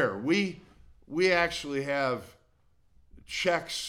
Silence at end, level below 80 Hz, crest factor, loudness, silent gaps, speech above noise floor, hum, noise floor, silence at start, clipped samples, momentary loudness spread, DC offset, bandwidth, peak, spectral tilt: 0 s; -58 dBFS; 18 dB; -29 LUFS; none; 36 dB; none; -65 dBFS; 0 s; under 0.1%; 13 LU; under 0.1%; 16.5 kHz; -12 dBFS; -4 dB/octave